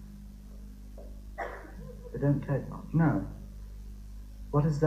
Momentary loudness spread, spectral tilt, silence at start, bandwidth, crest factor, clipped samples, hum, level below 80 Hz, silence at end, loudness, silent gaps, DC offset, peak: 21 LU; -9 dB/octave; 0 s; 9 kHz; 18 dB; under 0.1%; 50 Hz at -45 dBFS; -44 dBFS; 0 s; -31 LUFS; none; under 0.1%; -14 dBFS